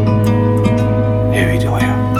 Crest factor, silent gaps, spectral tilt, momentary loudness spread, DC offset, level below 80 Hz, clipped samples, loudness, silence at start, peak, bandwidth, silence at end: 12 dB; none; -7.5 dB/octave; 2 LU; under 0.1%; -30 dBFS; under 0.1%; -14 LUFS; 0 s; -2 dBFS; 13.5 kHz; 0 s